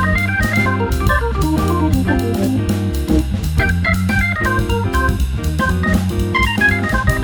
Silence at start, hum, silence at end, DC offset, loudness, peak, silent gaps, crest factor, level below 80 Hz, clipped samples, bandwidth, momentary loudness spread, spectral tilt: 0 s; none; 0 s; under 0.1%; -16 LUFS; -2 dBFS; none; 14 dB; -22 dBFS; under 0.1%; over 20 kHz; 3 LU; -6 dB/octave